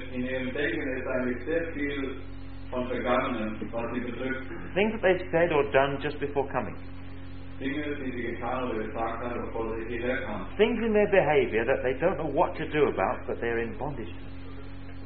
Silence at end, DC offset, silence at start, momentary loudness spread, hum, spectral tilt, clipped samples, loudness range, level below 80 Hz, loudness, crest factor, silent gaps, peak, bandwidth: 0 s; 1%; 0 s; 17 LU; none; -10 dB/octave; under 0.1%; 7 LU; -46 dBFS; -29 LUFS; 22 dB; none; -8 dBFS; 4.6 kHz